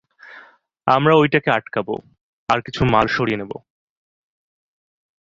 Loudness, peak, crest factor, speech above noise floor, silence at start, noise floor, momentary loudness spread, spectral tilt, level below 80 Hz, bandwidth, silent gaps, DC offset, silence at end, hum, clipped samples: -18 LUFS; -2 dBFS; 20 dB; 30 dB; 0.25 s; -48 dBFS; 16 LU; -7 dB/octave; -46 dBFS; 7.6 kHz; 2.21-2.47 s; under 0.1%; 1.6 s; none; under 0.1%